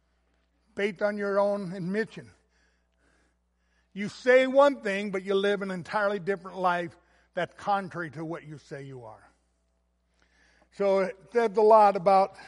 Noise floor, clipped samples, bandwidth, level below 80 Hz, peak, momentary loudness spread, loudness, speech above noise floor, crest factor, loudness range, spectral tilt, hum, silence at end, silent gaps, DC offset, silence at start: -72 dBFS; under 0.1%; 11.5 kHz; -70 dBFS; -8 dBFS; 21 LU; -26 LUFS; 46 dB; 20 dB; 10 LU; -6 dB/octave; none; 0 s; none; under 0.1%; 0.75 s